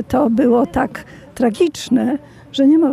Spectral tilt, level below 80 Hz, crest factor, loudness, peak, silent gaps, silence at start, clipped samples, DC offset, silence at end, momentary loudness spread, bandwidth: -6 dB/octave; -46 dBFS; 12 dB; -17 LUFS; -4 dBFS; none; 0 s; under 0.1%; under 0.1%; 0 s; 13 LU; 14.5 kHz